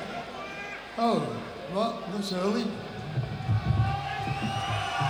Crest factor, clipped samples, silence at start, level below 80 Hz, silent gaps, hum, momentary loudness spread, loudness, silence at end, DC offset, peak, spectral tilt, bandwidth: 16 dB; under 0.1%; 0 s; -46 dBFS; none; none; 10 LU; -30 LUFS; 0 s; under 0.1%; -14 dBFS; -6 dB/octave; 20 kHz